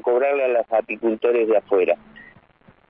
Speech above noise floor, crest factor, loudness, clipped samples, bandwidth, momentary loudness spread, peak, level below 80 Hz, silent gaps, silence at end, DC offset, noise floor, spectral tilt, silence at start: 35 dB; 14 dB; -20 LUFS; under 0.1%; 3.8 kHz; 5 LU; -6 dBFS; -66 dBFS; none; 0.7 s; under 0.1%; -55 dBFS; -9 dB/octave; 0.05 s